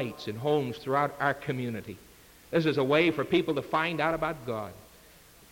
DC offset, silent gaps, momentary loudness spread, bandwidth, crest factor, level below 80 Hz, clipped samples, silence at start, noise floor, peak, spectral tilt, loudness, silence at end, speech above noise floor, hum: under 0.1%; none; 12 LU; 17 kHz; 18 dB; -60 dBFS; under 0.1%; 0 s; -55 dBFS; -12 dBFS; -6.5 dB/octave; -29 LUFS; 0.65 s; 26 dB; none